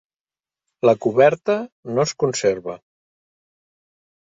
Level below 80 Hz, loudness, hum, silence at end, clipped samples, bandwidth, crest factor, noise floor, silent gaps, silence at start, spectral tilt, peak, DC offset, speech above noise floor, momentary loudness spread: -62 dBFS; -19 LUFS; none; 1.55 s; under 0.1%; 8 kHz; 20 dB; under -90 dBFS; 1.72-1.83 s; 0.85 s; -5 dB/octave; -2 dBFS; under 0.1%; over 71 dB; 12 LU